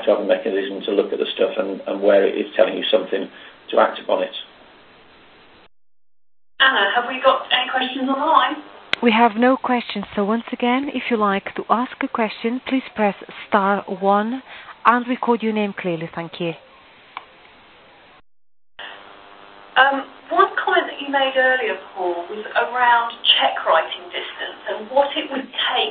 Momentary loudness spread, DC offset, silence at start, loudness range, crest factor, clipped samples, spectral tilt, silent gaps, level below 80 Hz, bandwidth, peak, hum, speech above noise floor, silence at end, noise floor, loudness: 12 LU; under 0.1%; 0 s; 7 LU; 20 dB; under 0.1%; -6.5 dB/octave; none; -64 dBFS; 4.8 kHz; 0 dBFS; none; 29 dB; 0 s; -49 dBFS; -19 LUFS